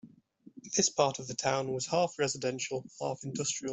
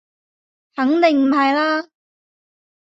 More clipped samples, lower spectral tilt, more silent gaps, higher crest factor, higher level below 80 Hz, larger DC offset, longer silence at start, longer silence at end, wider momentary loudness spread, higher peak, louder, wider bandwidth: neither; second, -3 dB/octave vs -4.5 dB/octave; neither; about the same, 20 dB vs 16 dB; about the same, -70 dBFS vs -70 dBFS; neither; second, 0.05 s vs 0.75 s; second, 0 s vs 1.05 s; about the same, 9 LU vs 9 LU; second, -12 dBFS vs -4 dBFS; second, -32 LUFS vs -17 LUFS; about the same, 8.4 kHz vs 7.8 kHz